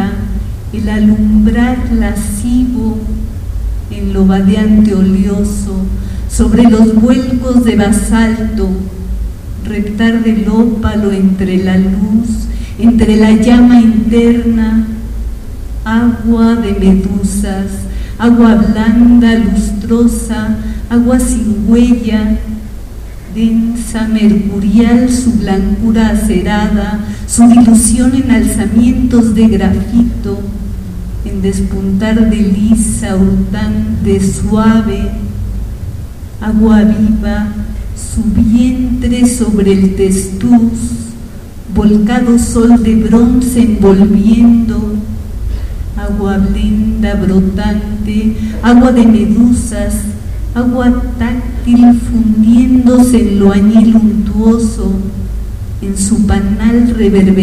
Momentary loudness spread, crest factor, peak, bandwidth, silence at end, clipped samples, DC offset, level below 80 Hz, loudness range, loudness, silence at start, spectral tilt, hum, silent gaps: 14 LU; 10 dB; 0 dBFS; 14.5 kHz; 0 s; 0.7%; under 0.1%; -20 dBFS; 4 LU; -10 LUFS; 0 s; -6.5 dB/octave; none; none